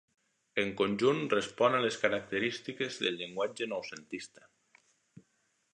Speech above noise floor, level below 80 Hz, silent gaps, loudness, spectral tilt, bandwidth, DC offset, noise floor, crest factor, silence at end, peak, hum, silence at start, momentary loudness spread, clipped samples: 43 dB; -72 dBFS; none; -32 LUFS; -4.5 dB/octave; 10.5 kHz; under 0.1%; -75 dBFS; 22 dB; 1.5 s; -12 dBFS; none; 0.55 s; 14 LU; under 0.1%